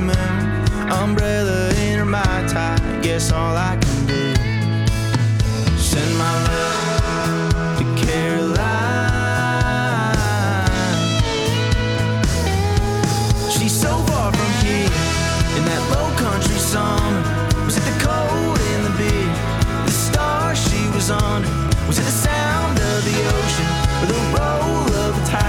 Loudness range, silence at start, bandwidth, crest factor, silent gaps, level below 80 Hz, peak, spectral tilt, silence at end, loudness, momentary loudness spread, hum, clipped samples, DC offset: 1 LU; 0 s; 17 kHz; 12 dB; none; -26 dBFS; -6 dBFS; -5 dB/octave; 0 s; -18 LUFS; 2 LU; none; under 0.1%; under 0.1%